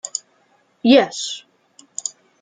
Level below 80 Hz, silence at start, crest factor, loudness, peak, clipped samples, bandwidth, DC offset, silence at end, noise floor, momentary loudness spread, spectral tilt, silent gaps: -68 dBFS; 0.05 s; 20 dB; -19 LUFS; -2 dBFS; under 0.1%; 9.6 kHz; under 0.1%; 0.35 s; -60 dBFS; 18 LU; -2.5 dB/octave; none